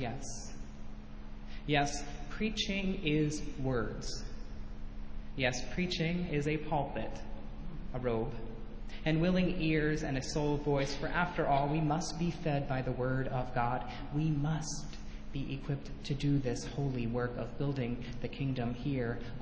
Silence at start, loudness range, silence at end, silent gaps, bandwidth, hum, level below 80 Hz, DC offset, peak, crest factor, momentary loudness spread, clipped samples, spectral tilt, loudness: 0 s; 4 LU; 0 s; none; 8 kHz; none; -46 dBFS; under 0.1%; -16 dBFS; 18 dB; 16 LU; under 0.1%; -5.5 dB/octave; -35 LUFS